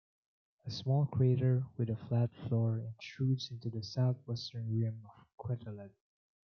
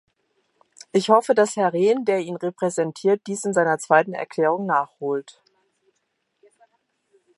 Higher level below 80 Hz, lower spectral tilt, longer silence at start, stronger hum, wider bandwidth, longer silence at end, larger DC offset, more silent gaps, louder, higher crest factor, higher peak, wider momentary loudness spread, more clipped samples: about the same, -72 dBFS vs -76 dBFS; first, -8 dB/octave vs -5 dB/octave; second, 0.65 s vs 0.95 s; neither; second, 6.6 kHz vs 11.5 kHz; second, 0.6 s vs 2.15 s; neither; first, 5.33-5.38 s vs none; second, -35 LUFS vs -21 LUFS; about the same, 16 dB vs 20 dB; second, -18 dBFS vs -2 dBFS; first, 16 LU vs 9 LU; neither